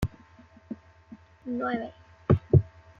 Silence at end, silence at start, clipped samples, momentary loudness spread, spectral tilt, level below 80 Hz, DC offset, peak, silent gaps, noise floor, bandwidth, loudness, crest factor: 0.35 s; 0 s; under 0.1%; 21 LU; -9.5 dB/octave; -48 dBFS; under 0.1%; -6 dBFS; none; -54 dBFS; 7 kHz; -27 LUFS; 22 dB